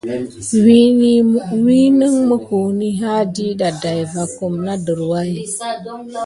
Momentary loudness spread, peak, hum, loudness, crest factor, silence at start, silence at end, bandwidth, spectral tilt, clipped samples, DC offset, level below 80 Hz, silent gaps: 12 LU; 0 dBFS; none; -15 LUFS; 14 dB; 0.05 s; 0 s; 11.5 kHz; -6 dB/octave; under 0.1%; under 0.1%; -52 dBFS; none